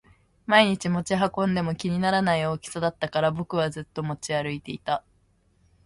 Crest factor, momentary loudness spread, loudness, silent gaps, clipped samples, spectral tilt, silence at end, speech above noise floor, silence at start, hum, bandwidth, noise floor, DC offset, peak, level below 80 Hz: 22 dB; 11 LU; -25 LUFS; none; under 0.1%; -5.5 dB/octave; 0.85 s; 39 dB; 0.5 s; none; 11.5 kHz; -64 dBFS; under 0.1%; -4 dBFS; -56 dBFS